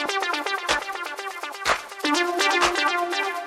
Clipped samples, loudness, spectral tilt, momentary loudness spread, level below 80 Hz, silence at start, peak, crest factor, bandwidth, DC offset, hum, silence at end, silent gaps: under 0.1%; -23 LUFS; -1 dB/octave; 11 LU; -56 dBFS; 0 s; -6 dBFS; 18 dB; 16 kHz; under 0.1%; none; 0 s; none